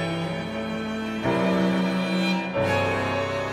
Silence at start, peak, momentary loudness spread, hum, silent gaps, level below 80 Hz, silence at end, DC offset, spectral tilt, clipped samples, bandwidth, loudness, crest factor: 0 s; -12 dBFS; 7 LU; none; none; -54 dBFS; 0 s; under 0.1%; -6 dB/octave; under 0.1%; 14.5 kHz; -25 LUFS; 12 dB